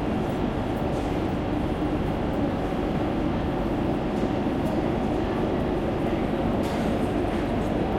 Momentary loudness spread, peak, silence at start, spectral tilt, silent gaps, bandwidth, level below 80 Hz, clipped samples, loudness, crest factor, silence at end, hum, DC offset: 1 LU; -12 dBFS; 0 s; -7.5 dB/octave; none; 16.5 kHz; -36 dBFS; under 0.1%; -26 LUFS; 12 dB; 0 s; none; under 0.1%